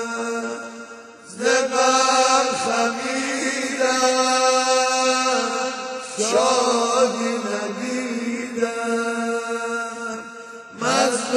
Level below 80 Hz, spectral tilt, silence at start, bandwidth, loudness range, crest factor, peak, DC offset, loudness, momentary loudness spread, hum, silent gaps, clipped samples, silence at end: -68 dBFS; -1.5 dB/octave; 0 s; 16 kHz; 6 LU; 16 dB; -6 dBFS; under 0.1%; -20 LUFS; 13 LU; none; none; under 0.1%; 0 s